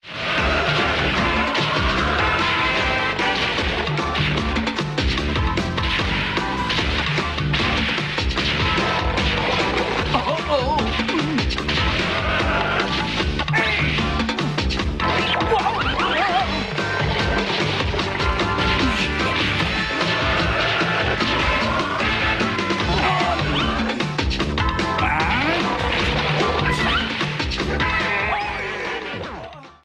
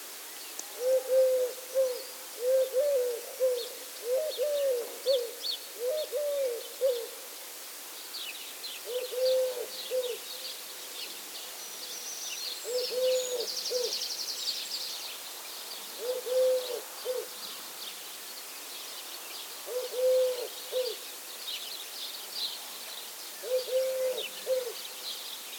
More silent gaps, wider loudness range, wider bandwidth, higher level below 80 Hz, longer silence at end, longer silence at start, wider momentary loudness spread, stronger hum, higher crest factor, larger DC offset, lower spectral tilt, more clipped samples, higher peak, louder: neither; second, 2 LU vs 5 LU; second, 11.5 kHz vs over 20 kHz; first, -30 dBFS vs under -90 dBFS; first, 0.15 s vs 0 s; about the same, 0.05 s vs 0 s; second, 4 LU vs 11 LU; neither; about the same, 14 dB vs 16 dB; neither; first, -5 dB/octave vs 1.5 dB/octave; neither; first, -6 dBFS vs -16 dBFS; first, -20 LUFS vs -33 LUFS